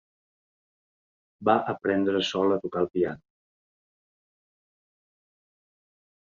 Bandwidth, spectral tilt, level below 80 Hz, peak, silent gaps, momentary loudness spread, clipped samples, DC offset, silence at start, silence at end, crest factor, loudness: 7.4 kHz; -5.5 dB/octave; -66 dBFS; -8 dBFS; none; 5 LU; under 0.1%; under 0.1%; 1.4 s; 3.15 s; 24 dB; -26 LUFS